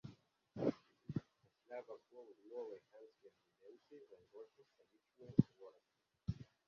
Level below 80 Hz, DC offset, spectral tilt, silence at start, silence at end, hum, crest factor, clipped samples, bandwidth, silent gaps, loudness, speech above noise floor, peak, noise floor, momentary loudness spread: -68 dBFS; under 0.1%; -9.5 dB/octave; 0.05 s; 0.25 s; none; 32 dB; under 0.1%; 7 kHz; none; -44 LUFS; 39 dB; -16 dBFS; -85 dBFS; 25 LU